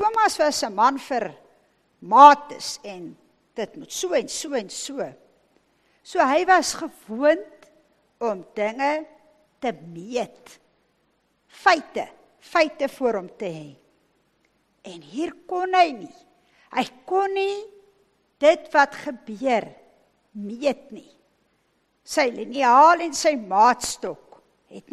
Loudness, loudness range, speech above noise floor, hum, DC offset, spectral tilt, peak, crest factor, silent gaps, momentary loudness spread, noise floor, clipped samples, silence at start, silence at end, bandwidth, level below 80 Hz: -21 LUFS; 10 LU; 46 dB; none; under 0.1%; -2.5 dB/octave; 0 dBFS; 24 dB; none; 17 LU; -68 dBFS; under 0.1%; 0 s; 0.15 s; 13 kHz; -66 dBFS